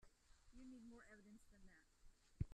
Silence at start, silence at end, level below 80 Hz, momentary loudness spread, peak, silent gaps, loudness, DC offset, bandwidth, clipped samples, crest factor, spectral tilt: 0 s; 0 s; -66 dBFS; 10 LU; -32 dBFS; none; -61 LUFS; under 0.1%; 11.5 kHz; under 0.1%; 26 dB; -7 dB/octave